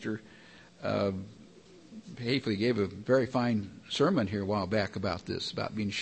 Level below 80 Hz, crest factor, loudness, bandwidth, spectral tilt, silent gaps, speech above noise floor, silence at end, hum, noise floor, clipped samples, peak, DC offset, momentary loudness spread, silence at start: -64 dBFS; 18 dB; -31 LUFS; 8.8 kHz; -6 dB/octave; none; 24 dB; 0 s; none; -55 dBFS; under 0.1%; -14 dBFS; under 0.1%; 14 LU; 0 s